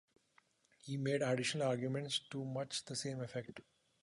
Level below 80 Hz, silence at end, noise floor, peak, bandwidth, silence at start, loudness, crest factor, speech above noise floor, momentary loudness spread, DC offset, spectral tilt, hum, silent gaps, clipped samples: -80 dBFS; 0.4 s; -74 dBFS; -24 dBFS; 11.5 kHz; 0.85 s; -39 LUFS; 18 dB; 34 dB; 11 LU; under 0.1%; -4.5 dB/octave; none; none; under 0.1%